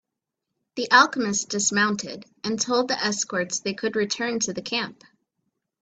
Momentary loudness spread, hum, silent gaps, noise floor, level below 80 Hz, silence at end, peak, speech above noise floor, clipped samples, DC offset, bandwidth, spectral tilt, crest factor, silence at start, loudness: 14 LU; none; none; -83 dBFS; -68 dBFS; 0.9 s; -2 dBFS; 59 dB; under 0.1%; under 0.1%; 9.2 kHz; -2 dB/octave; 24 dB; 0.75 s; -23 LUFS